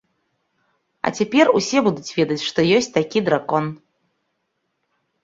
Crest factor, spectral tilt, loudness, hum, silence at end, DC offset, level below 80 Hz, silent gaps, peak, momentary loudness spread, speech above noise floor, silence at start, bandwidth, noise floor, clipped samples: 18 dB; -5 dB/octave; -19 LUFS; none; 1.5 s; under 0.1%; -62 dBFS; none; -2 dBFS; 8 LU; 55 dB; 1.05 s; 8 kHz; -73 dBFS; under 0.1%